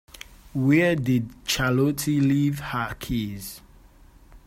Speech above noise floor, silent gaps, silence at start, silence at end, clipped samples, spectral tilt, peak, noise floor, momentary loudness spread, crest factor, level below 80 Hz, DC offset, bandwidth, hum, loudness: 28 dB; none; 0.55 s; 0.1 s; under 0.1%; -5.5 dB/octave; -8 dBFS; -51 dBFS; 18 LU; 16 dB; -46 dBFS; under 0.1%; 16 kHz; none; -24 LUFS